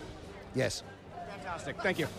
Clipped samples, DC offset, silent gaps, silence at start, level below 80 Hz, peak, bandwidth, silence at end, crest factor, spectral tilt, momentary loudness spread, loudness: under 0.1%; under 0.1%; none; 0 s; -58 dBFS; -20 dBFS; 19.5 kHz; 0 s; 16 dB; -4.5 dB/octave; 14 LU; -36 LUFS